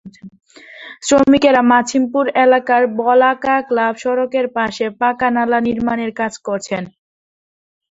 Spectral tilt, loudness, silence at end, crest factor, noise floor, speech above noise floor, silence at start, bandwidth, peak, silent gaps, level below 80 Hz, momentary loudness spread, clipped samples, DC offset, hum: -4 dB/octave; -15 LUFS; 1 s; 16 dB; -37 dBFS; 23 dB; 0.05 s; 8 kHz; 0 dBFS; none; -52 dBFS; 12 LU; under 0.1%; under 0.1%; none